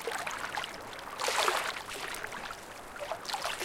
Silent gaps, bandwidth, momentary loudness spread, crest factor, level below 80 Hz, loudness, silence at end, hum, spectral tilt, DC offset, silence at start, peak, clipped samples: none; 17 kHz; 13 LU; 26 dB; -60 dBFS; -35 LUFS; 0 s; none; -1 dB/octave; under 0.1%; 0 s; -10 dBFS; under 0.1%